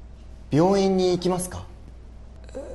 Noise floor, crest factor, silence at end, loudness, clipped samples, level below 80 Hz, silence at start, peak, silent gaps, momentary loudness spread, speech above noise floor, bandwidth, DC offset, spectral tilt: -42 dBFS; 16 dB; 0 s; -22 LUFS; under 0.1%; -44 dBFS; 0 s; -8 dBFS; none; 20 LU; 21 dB; 12.5 kHz; under 0.1%; -6 dB/octave